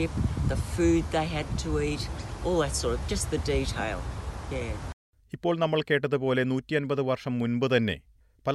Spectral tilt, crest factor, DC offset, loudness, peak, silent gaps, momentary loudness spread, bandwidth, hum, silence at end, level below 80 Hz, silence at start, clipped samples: -5.5 dB/octave; 18 dB; under 0.1%; -28 LUFS; -10 dBFS; 4.93-5.13 s; 10 LU; 12.5 kHz; none; 0 s; -38 dBFS; 0 s; under 0.1%